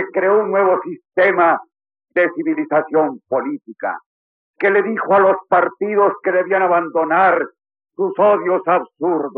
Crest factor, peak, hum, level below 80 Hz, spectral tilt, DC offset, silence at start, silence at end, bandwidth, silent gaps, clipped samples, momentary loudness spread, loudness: 14 dB; -4 dBFS; none; -84 dBFS; -4.5 dB/octave; under 0.1%; 0 s; 0.05 s; 4.4 kHz; 4.06-4.54 s; under 0.1%; 10 LU; -17 LUFS